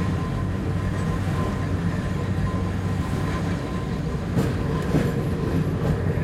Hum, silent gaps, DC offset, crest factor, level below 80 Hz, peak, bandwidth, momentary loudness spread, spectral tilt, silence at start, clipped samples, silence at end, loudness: none; none; under 0.1%; 16 dB; -34 dBFS; -8 dBFS; 13.5 kHz; 3 LU; -7.5 dB/octave; 0 s; under 0.1%; 0 s; -25 LUFS